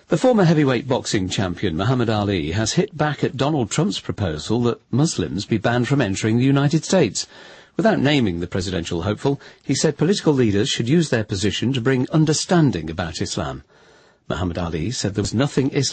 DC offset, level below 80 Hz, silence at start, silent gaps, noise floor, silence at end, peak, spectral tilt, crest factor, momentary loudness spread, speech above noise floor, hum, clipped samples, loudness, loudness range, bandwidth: under 0.1%; -46 dBFS; 0.1 s; none; -52 dBFS; 0 s; -6 dBFS; -5.5 dB/octave; 14 dB; 8 LU; 33 dB; none; under 0.1%; -20 LUFS; 2 LU; 8.8 kHz